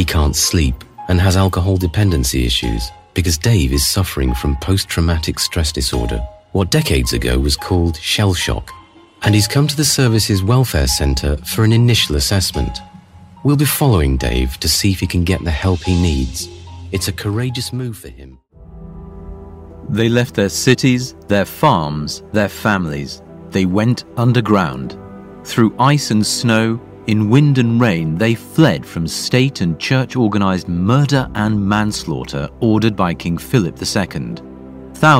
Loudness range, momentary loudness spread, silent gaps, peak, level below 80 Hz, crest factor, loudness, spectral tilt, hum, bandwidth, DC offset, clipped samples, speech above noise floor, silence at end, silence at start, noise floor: 4 LU; 12 LU; none; 0 dBFS; -26 dBFS; 16 dB; -16 LUFS; -5 dB/octave; none; 16.5 kHz; under 0.1%; under 0.1%; 25 dB; 0 s; 0 s; -40 dBFS